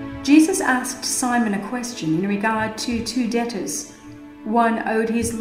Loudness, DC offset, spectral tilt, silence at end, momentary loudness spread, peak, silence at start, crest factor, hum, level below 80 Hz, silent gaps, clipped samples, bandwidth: -21 LUFS; under 0.1%; -4 dB/octave; 0 s; 12 LU; -2 dBFS; 0 s; 18 dB; none; -50 dBFS; none; under 0.1%; 16 kHz